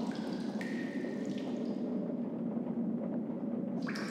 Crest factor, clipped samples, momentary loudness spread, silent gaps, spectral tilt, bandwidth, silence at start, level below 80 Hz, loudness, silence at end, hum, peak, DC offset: 12 dB; under 0.1%; 2 LU; none; -7 dB/octave; 11 kHz; 0 s; -78 dBFS; -37 LUFS; 0 s; none; -24 dBFS; under 0.1%